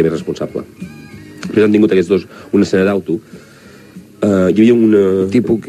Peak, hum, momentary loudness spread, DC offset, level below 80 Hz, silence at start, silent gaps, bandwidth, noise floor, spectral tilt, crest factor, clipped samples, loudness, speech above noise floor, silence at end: 0 dBFS; none; 20 LU; under 0.1%; -50 dBFS; 0 s; none; 13.5 kHz; -40 dBFS; -7.5 dB/octave; 14 dB; under 0.1%; -13 LUFS; 27 dB; 0 s